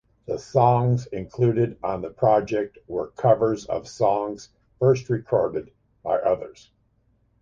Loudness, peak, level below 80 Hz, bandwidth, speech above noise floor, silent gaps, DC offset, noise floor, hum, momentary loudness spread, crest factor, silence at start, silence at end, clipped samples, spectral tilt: -23 LUFS; -4 dBFS; -54 dBFS; 7.6 kHz; 42 dB; none; under 0.1%; -65 dBFS; none; 13 LU; 20 dB; 0.3 s; 0.9 s; under 0.1%; -8 dB/octave